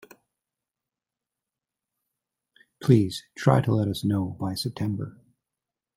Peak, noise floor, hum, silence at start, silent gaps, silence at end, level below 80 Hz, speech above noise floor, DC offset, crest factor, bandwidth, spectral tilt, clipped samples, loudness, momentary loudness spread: -4 dBFS; -89 dBFS; none; 2.8 s; none; 0.85 s; -62 dBFS; 65 dB; under 0.1%; 24 dB; 15.5 kHz; -7 dB/octave; under 0.1%; -25 LUFS; 9 LU